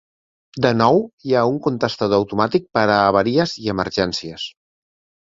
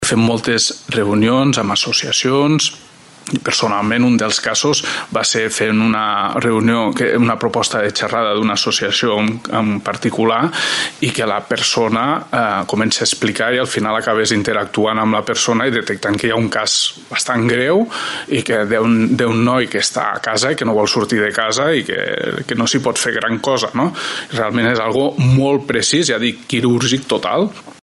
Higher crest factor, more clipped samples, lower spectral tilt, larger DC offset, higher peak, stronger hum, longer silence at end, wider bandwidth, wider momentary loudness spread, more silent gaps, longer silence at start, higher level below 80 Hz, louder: about the same, 18 dB vs 16 dB; neither; first, -6 dB/octave vs -4 dB/octave; neither; about the same, -2 dBFS vs 0 dBFS; neither; first, 0.75 s vs 0.1 s; second, 7.8 kHz vs 12 kHz; first, 10 LU vs 5 LU; first, 1.13-1.18 s vs none; first, 0.55 s vs 0 s; about the same, -50 dBFS vs -52 dBFS; second, -18 LUFS vs -15 LUFS